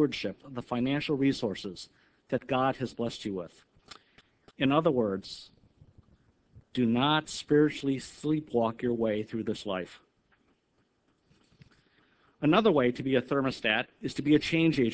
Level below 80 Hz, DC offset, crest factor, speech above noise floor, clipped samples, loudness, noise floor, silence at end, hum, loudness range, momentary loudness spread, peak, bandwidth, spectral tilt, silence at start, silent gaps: -62 dBFS; under 0.1%; 22 dB; 44 dB; under 0.1%; -29 LUFS; -73 dBFS; 0 s; none; 6 LU; 13 LU; -8 dBFS; 8 kHz; -6 dB/octave; 0 s; none